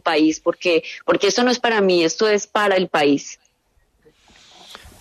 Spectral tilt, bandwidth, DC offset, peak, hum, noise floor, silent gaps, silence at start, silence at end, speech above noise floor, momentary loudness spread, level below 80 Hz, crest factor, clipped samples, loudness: -3.5 dB/octave; 13.5 kHz; under 0.1%; -4 dBFS; none; -62 dBFS; none; 0.05 s; 0.25 s; 45 dB; 5 LU; -60 dBFS; 14 dB; under 0.1%; -18 LUFS